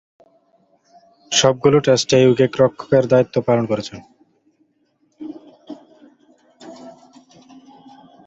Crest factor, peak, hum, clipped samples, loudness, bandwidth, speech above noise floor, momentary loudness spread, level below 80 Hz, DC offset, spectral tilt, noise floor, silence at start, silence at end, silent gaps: 20 dB; 0 dBFS; none; under 0.1%; -16 LUFS; 8 kHz; 48 dB; 25 LU; -56 dBFS; under 0.1%; -4.5 dB/octave; -64 dBFS; 1.3 s; 1.35 s; none